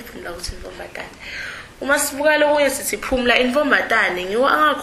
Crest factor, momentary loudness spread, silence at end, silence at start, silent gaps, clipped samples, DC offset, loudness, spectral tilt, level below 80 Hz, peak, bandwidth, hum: 18 dB; 17 LU; 0 s; 0 s; none; under 0.1%; under 0.1%; -17 LUFS; -2 dB/octave; -42 dBFS; 0 dBFS; 15 kHz; none